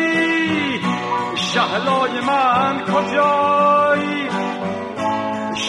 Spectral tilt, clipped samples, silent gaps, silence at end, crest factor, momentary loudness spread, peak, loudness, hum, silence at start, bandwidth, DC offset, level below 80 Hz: -4.5 dB/octave; under 0.1%; none; 0 s; 14 dB; 8 LU; -4 dBFS; -18 LUFS; none; 0 s; 11.5 kHz; under 0.1%; -58 dBFS